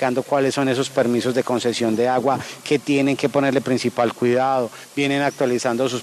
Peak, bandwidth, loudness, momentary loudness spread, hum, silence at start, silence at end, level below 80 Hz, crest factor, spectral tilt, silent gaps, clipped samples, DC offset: -4 dBFS; 13.5 kHz; -20 LUFS; 4 LU; none; 0 s; 0 s; -64 dBFS; 16 dB; -5 dB/octave; none; under 0.1%; under 0.1%